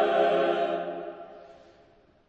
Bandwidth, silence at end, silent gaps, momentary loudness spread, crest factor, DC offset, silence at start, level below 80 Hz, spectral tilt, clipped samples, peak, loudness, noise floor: 8.2 kHz; 0.75 s; none; 21 LU; 16 dB; under 0.1%; 0 s; -70 dBFS; -6 dB/octave; under 0.1%; -12 dBFS; -27 LUFS; -59 dBFS